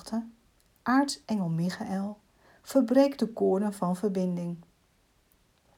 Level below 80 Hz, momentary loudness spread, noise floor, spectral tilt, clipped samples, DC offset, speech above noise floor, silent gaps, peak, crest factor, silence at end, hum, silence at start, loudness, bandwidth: -68 dBFS; 14 LU; -67 dBFS; -6.5 dB/octave; under 0.1%; under 0.1%; 40 dB; none; -10 dBFS; 20 dB; 1.15 s; none; 0.05 s; -29 LUFS; 16 kHz